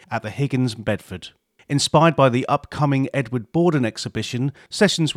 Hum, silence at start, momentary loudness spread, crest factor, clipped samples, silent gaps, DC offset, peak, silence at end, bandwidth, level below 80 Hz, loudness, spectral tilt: none; 0.1 s; 12 LU; 18 dB; under 0.1%; none; under 0.1%; -2 dBFS; 0.05 s; 14.5 kHz; -54 dBFS; -21 LUFS; -5.5 dB/octave